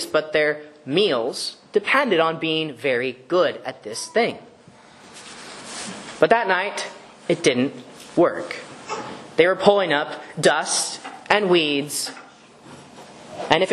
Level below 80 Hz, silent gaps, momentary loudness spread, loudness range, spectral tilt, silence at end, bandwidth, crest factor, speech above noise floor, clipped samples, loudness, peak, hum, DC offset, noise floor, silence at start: -66 dBFS; none; 17 LU; 5 LU; -3.5 dB/octave; 0 s; 12.5 kHz; 22 dB; 28 dB; under 0.1%; -21 LUFS; 0 dBFS; none; under 0.1%; -48 dBFS; 0 s